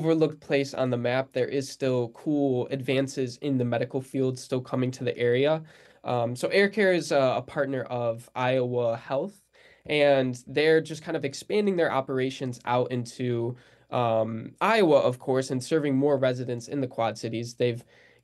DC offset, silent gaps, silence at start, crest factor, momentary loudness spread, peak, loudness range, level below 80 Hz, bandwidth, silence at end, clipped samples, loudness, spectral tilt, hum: under 0.1%; none; 0 s; 18 dB; 9 LU; -8 dBFS; 3 LU; -70 dBFS; 12.5 kHz; 0.4 s; under 0.1%; -27 LUFS; -6 dB/octave; none